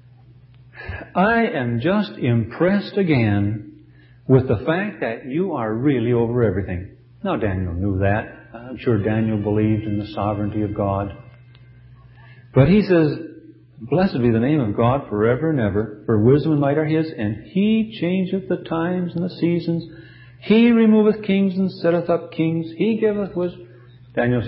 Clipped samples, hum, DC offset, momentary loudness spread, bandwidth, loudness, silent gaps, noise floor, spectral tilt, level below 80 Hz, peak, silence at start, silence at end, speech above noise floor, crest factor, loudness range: under 0.1%; none; under 0.1%; 11 LU; 5.6 kHz; -20 LUFS; none; -48 dBFS; -12.5 dB/octave; -42 dBFS; -2 dBFS; 0.75 s; 0 s; 29 dB; 18 dB; 4 LU